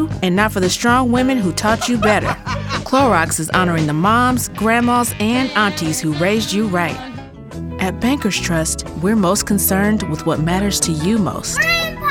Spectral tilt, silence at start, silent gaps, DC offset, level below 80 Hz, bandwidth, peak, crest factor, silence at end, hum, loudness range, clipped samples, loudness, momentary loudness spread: -4.5 dB/octave; 0 s; none; under 0.1%; -36 dBFS; 19 kHz; 0 dBFS; 16 dB; 0 s; none; 3 LU; under 0.1%; -16 LUFS; 7 LU